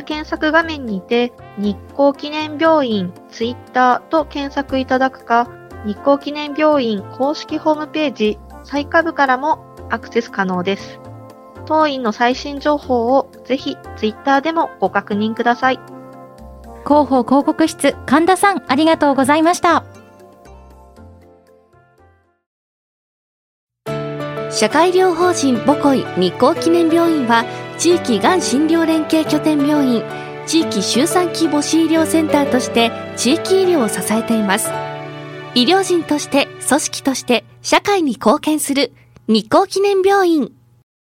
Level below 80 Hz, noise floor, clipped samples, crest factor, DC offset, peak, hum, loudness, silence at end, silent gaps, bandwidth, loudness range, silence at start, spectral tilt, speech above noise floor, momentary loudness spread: -48 dBFS; -53 dBFS; under 0.1%; 16 dB; under 0.1%; 0 dBFS; none; -16 LUFS; 0.65 s; 22.46-23.67 s; 16.5 kHz; 4 LU; 0 s; -4 dB/octave; 37 dB; 11 LU